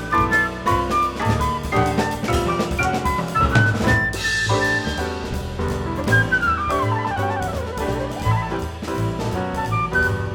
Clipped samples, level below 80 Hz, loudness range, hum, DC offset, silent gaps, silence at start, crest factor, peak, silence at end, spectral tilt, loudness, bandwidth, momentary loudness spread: under 0.1%; -32 dBFS; 3 LU; none; under 0.1%; none; 0 s; 18 dB; -2 dBFS; 0 s; -5.5 dB/octave; -21 LUFS; 19 kHz; 8 LU